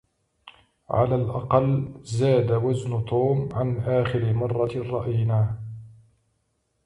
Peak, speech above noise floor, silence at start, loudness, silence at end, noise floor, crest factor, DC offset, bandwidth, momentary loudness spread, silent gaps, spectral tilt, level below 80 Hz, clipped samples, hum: -6 dBFS; 49 dB; 0.45 s; -24 LUFS; 0.95 s; -72 dBFS; 18 dB; under 0.1%; 10.5 kHz; 7 LU; none; -8.5 dB/octave; -50 dBFS; under 0.1%; none